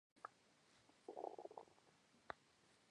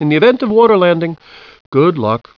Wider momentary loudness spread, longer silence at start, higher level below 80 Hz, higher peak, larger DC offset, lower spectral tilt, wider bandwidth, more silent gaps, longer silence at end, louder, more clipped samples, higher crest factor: about the same, 9 LU vs 10 LU; first, 0.15 s vs 0 s; second, under -90 dBFS vs -54 dBFS; second, -28 dBFS vs 0 dBFS; neither; second, -4 dB/octave vs -9 dB/octave; first, 10.5 kHz vs 5.4 kHz; second, none vs 1.60-1.72 s; second, 0 s vs 0.2 s; second, -58 LUFS vs -12 LUFS; neither; first, 32 dB vs 12 dB